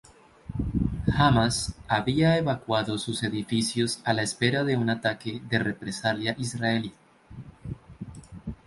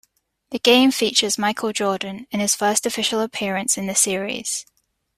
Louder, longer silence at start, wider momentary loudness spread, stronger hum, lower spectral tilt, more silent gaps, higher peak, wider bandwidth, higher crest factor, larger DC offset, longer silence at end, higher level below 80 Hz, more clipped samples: second, -26 LUFS vs -20 LUFS; about the same, 0.45 s vs 0.5 s; first, 18 LU vs 11 LU; neither; first, -5 dB/octave vs -2 dB/octave; neither; second, -6 dBFS vs -2 dBFS; second, 11.5 kHz vs 16 kHz; about the same, 20 dB vs 20 dB; neither; second, 0.1 s vs 0.55 s; first, -44 dBFS vs -62 dBFS; neither